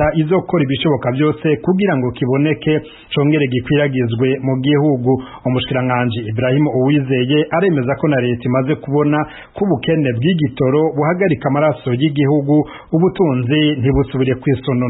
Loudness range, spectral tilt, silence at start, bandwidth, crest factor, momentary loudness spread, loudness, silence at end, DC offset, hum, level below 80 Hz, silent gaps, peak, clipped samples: 1 LU; -12.5 dB/octave; 0 s; 4.1 kHz; 12 dB; 4 LU; -16 LUFS; 0 s; under 0.1%; none; -42 dBFS; none; -4 dBFS; under 0.1%